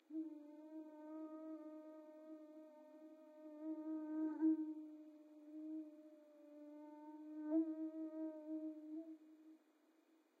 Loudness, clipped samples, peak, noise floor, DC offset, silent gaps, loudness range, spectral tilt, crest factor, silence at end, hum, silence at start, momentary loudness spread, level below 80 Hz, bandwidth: -48 LUFS; under 0.1%; -30 dBFS; -75 dBFS; under 0.1%; none; 8 LU; -6.5 dB/octave; 18 dB; 0.25 s; none; 0.1 s; 20 LU; under -90 dBFS; 2.6 kHz